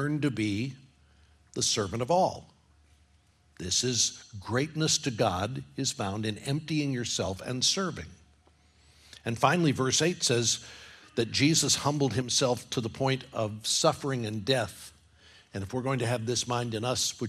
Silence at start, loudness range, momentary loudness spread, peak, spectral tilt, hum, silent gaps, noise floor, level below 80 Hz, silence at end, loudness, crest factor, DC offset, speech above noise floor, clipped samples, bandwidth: 0 s; 5 LU; 12 LU; -8 dBFS; -3.5 dB/octave; none; none; -64 dBFS; -64 dBFS; 0 s; -28 LUFS; 22 dB; under 0.1%; 35 dB; under 0.1%; 15 kHz